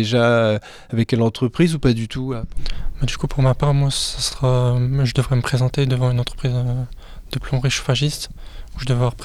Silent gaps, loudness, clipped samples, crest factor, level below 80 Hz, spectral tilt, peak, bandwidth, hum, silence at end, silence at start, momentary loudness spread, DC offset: none; -20 LUFS; under 0.1%; 14 dB; -32 dBFS; -6 dB/octave; -4 dBFS; 13 kHz; none; 0 s; 0 s; 13 LU; under 0.1%